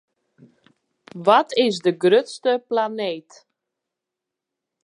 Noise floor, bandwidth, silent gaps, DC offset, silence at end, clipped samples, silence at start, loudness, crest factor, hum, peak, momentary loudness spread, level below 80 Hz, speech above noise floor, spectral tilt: -85 dBFS; 11 kHz; none; under 0.1%; 1.65 s; under 0.1%; 1.15 s; -20 LUFS; 20 dB; none; -2 dBFS; 11 LU; -80 dBFS; 65 dB; -5 dB/octave